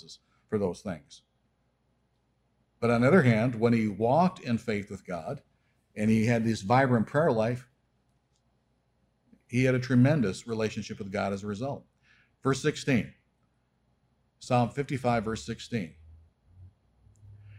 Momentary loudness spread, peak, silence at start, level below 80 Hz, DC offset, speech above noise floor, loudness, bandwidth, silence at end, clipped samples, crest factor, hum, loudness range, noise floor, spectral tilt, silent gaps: 14 LU; -10 dBFS; 0.1 s; -60 dBFS; under 0.1%; 45 dB; -28 LUFS; 12 kHz; 0 s; under 0.1%; 18 dB; none; 6 LU; -72 dBFS; -7 dB/octave; none